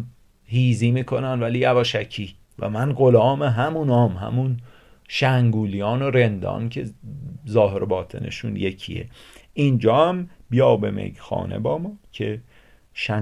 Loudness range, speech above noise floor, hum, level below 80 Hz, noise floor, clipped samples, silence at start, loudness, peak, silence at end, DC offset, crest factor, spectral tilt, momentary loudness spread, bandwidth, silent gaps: 4 LU; 21 dB; none; -48 dBFS; -41 dBFS; under 0.1%; 0 s; -21 LUFS; -4 dBFS; 0 s; under 0.1%; 18 dB; -7.5 dB/octave; 15 LU; 10 kHz; none